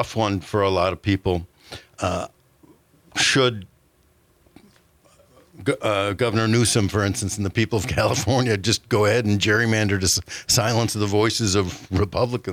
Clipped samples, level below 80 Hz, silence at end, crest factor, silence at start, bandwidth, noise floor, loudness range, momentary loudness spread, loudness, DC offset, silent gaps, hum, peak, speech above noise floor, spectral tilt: under 0.1%; -48 dBFS; 0 s; 16 dB; 0 s; 16 kHz; -60 dBFS; 6 LU; 8 LU; -21 LUFS; under 0.1%; none; none; -6 dBFS; 39 dB; -4 dB/octave